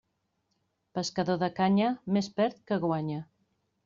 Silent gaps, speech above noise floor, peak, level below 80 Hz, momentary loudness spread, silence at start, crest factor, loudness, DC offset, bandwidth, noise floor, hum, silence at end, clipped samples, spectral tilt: none; 49 dB; -14 dBFS; -70 dBFS; 10 LU; 0.95 s; 16 dB; -30 LUFS; under 0.1%; 7.4 kHz; -78 dBFS; none; 0.6 s; under 0.1%; -5.5 dB/octave